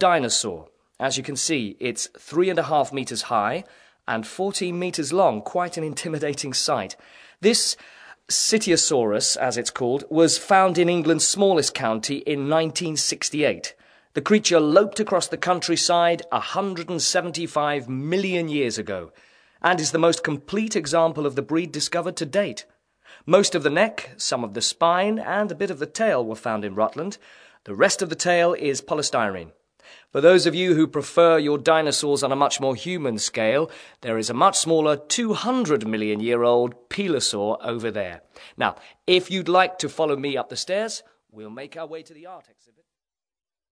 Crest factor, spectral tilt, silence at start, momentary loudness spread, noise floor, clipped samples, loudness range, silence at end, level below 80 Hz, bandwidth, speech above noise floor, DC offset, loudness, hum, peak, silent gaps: 20 dB; -3.5 dB/octave; 0 s; 11 LU; under -90 dBFS; under 0.1%; 5 LU; 1.3 s; -66 dBFS; 11 kHz; over 68 dB; under 0.1%; -22 LUFS; none; -2 dBFS; none